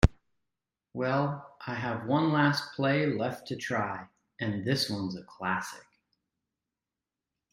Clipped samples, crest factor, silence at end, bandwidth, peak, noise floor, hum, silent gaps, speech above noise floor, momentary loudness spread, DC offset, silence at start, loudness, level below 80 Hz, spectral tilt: under 0.1%; 26 dB; 1.7 s; 16 kHz; -6 dBFS; -90 dBFS; none; none; 60 dB; 12 LU; under 0.1%; 0 s; -30 LUFS; -42 dBFS; -6 dB/octave